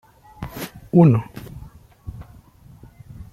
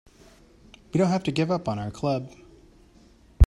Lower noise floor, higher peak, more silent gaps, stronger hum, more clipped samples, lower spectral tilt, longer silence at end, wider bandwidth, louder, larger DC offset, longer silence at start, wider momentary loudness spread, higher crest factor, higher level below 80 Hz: second, -47 dBFS vs -55 dBFS; about the same, -2 dBFS vs -4 dBFS; neither; neither; neither; first, -9 dB/octave vs -7.5 dB/octave; about the same, 0.1 s vs 0 s; first, 15 kHz vs 11 kHz; first, -18 LUFS vs -26 LUFS; neither; second, 0.4 s vs 0.95 s; first, 27 LU vs 8 LU; about the same, 20 dB vs 22 dB; second, -46 dBFS vs -32 dBFS